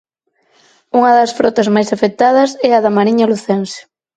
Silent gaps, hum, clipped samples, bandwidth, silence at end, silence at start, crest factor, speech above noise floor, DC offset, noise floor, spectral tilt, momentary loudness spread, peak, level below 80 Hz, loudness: none; none; under 0.1%; 9.2 kHz; 0.35 s; 0.95 s; 14 dB; 49 dB; under 0.1%; -60 dBFS; -5.5 dB/octave; 7 LU; 0 dBFS; -58 dBFS; -12 LUFS